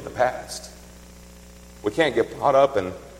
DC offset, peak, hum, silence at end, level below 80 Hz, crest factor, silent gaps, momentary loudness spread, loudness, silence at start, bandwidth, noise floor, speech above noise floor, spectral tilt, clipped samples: under 0.1%; -4 dBFS; 60 Hz at -45 dBFS; 0 s; -48 dBFS; 20 dB; none; 16 LU; -22 LUFS; 0 s; 16.5 kHz; -45 dBFS; 23 dB; -4.5 dB/octave; under 0.1%